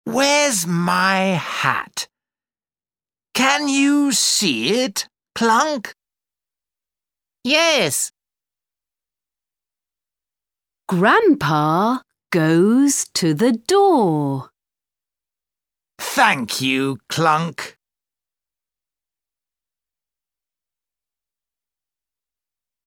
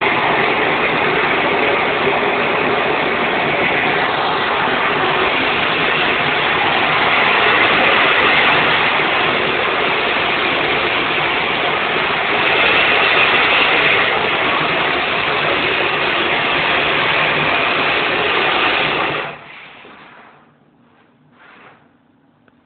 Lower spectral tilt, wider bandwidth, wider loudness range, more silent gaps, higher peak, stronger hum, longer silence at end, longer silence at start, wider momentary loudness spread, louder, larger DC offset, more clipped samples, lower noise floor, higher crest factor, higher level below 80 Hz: second, -3.5 dB/octave vs -7.5 dB/octave; first, 19 kHz vs 4.8 kHz; about the same, 6 LU vs 4 LU; neither; about the same, 0 dBFS vs 0 dBFS; neither; first, 5.15 s vs 2.6 s; about the same, 0.05 s vs 0 s; first, 12 LU vs 5 LU; second, -17 LUFS vs -14 LUFS; neither; neither; first, under -90 dBFS vs -54 dBFS; about the same, 20 dB vs 16 dB; second, -66 dBFS vs -48 dBFS